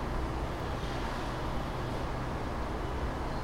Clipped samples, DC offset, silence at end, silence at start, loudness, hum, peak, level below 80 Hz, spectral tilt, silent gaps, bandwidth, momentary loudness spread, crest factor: under 0.1%; under 0.1%; 0 s; 0 s; -36 LUFS; none; -22 dBFS; -38 dBFS; -6 dB/octave; none; 16 kHz; 1 LU; 12 dB